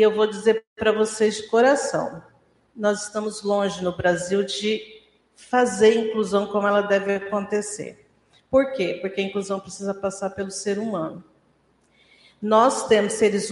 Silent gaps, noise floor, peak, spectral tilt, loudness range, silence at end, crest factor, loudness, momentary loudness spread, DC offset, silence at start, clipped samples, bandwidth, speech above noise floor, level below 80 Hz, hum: 0.67-0.76 s; -63 dBFS; -4 dBFS; -4 dB/octave; 5 LU; 0 s; 18 dB; -22 LUFS; 11 LU; under 0.1%; 0 s; under 0.1%; 11.5 kHz; 41 dB; -60 dBFS; none